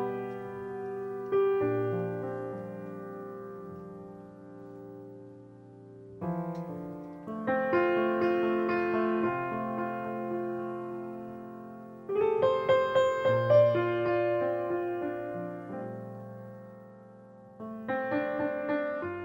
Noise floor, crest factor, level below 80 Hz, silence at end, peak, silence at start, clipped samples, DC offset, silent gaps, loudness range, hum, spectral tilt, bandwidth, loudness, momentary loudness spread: -52 dBFS; 18 dB; -70 dBFS; 0 s; -14 dBFS; 0 s; under 0.1%; under 0.1%; none; 15 LU; none; -8 dB/octave; 16 kHz; -30 LUFS; 20 LU